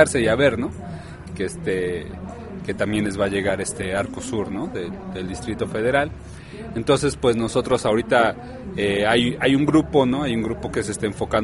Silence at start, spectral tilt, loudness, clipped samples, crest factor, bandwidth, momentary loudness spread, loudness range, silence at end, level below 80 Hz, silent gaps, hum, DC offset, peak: 0 s; -5 dB/octave; -22 LUFS; under 0.1%; 20 dB; 11.5 kHz; 15 LU; 6 LU; 0 s; -42 dBFS; none; none; under 0.1%; -2 dBFS